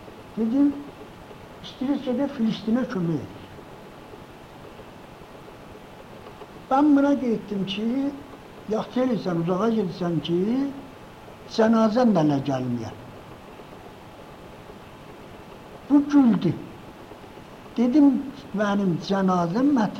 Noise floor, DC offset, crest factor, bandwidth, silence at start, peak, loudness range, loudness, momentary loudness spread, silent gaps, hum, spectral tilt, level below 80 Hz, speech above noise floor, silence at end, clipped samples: -43 dBFS; under 0.1%; 18 dB; 8.8 kHz; 0 s; -8 dBFS; 10 LU; -23 LUFS; 24 LU; none; none; -7.5 dB/octave; -56 dBFS; 22 dB; 0 s; under 0.1%